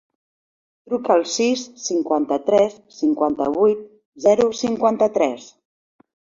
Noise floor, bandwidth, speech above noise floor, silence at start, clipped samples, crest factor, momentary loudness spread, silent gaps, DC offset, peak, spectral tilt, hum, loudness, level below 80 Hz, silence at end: under -90 dBFS; 7.6 kHz; over 71 dB; 0.9 s; under 0.1%; 18 dB; 7 LU; 4.05-4.12 s; under 0.1%; -2 dBFS; -4 dB/octave; none; -20 LUFS; -62 dBFS; 0.95 s